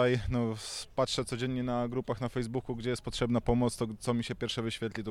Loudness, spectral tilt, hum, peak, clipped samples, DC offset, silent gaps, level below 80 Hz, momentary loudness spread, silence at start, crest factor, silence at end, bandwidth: -33 LUFS; -5.5 dB/octave; none; -14 dBFS; under 0.1%; under 0.1%; none; -48 dBFS; 6 LU; 0 s; 18 dB; 0 s; 14 kHz